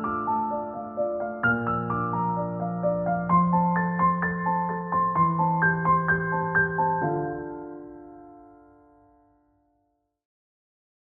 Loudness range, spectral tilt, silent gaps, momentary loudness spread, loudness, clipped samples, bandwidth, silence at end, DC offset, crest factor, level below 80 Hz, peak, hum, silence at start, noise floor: 8 LU; -7.5 dB/octave; none; 10 LU; -25 LUFS; under 0.1%; 3 kHz; 2.7 s; under 0.1%; 16 dB; -56 dBFS; -10 dBFS; none; 0 s; -73 dBFS